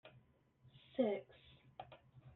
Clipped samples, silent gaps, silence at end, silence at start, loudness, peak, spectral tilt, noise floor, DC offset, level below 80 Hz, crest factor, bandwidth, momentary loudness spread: under 0.1%; none; 0.05 s; 0.05 s; -41 LUFS; -24 dBFS; -5.5 dB/octave; -70 dBFS; under 0.1%; -80 dBFS; 24 dB; 4.2 kHz; 24 LU